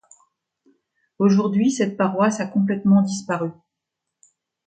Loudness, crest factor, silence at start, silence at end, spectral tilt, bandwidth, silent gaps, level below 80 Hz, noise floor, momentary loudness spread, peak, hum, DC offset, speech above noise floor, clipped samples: -20 LUFS; 16 dB; 1.2 s; 1.15 s; -6.5 dB/octave; 9 kHz; none; -66 dBFS; -82 dBFS; 8 LU; -6 dBFS; none; under 0.1%; 63 dB; under 0.1%